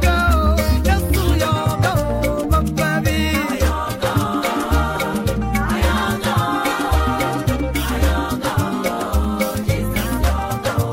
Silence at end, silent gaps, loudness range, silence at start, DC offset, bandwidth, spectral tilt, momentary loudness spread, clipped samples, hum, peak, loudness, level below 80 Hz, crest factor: 0 s; none; 2 LU; 0 s; under 0.1%; 16.5 kHz; -5.5 dB/octave; 4 LU; under 0.1%; none; -4 dBFS; -19 LUFS; -22 dBFS; 14 dB